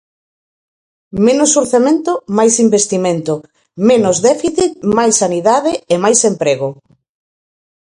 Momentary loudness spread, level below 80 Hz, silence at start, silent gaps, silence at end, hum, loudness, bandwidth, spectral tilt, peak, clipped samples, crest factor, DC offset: 7 LU; -52 dBFS; 1.15 s; none; 1.2 s; none; -13 LUFS; 11.5 kHz; -4 dB/octave; 0 dBFS; under 0.1%; 14 dB; under 0.1%